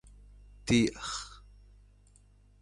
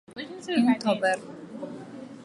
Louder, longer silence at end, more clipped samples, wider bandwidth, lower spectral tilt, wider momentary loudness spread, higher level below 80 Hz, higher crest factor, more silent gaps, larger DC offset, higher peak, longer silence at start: second, -31 LUFS vs -25 LUFS; first, 1.2 s vs 0 s; neither; about the same, 11.5 kHz vs 11.5 kHz; about the same, -4.5 dB/octave vs -5 dB/octave; about the same, 17 LU vs 18 LU; first, -52 dBFS vs -76 dBFS; about the same, 22 dB vs 18 dB; neither; neither; second, -14 dBFS vs -10 dBFS; first, 0.65 s vs 0.1 s